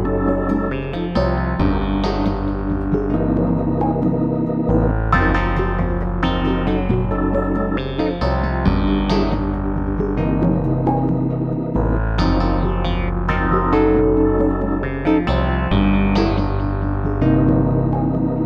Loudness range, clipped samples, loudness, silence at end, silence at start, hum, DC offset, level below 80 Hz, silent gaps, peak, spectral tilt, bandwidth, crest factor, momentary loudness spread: 2 LU; under 0.1%; -19 LUFS; 0 s; 0 s; none; under 0.1%; -24 dBFS; none; -2 dBFS; -9 dB/octave; 6.6 kHz; 16 dB; 5 LU